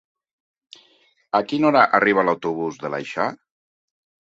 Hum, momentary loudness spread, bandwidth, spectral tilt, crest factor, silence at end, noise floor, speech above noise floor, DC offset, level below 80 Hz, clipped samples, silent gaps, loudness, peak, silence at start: none; 11 LU; 7.8 kHz; -6 dB/octave; 20 dB; 0.95 s; -60 dBFS; 40 dB; under 0.1%; -66 dBFS; under 0.1%; none; -20 LUFS; -2 dBFS; 1.35 s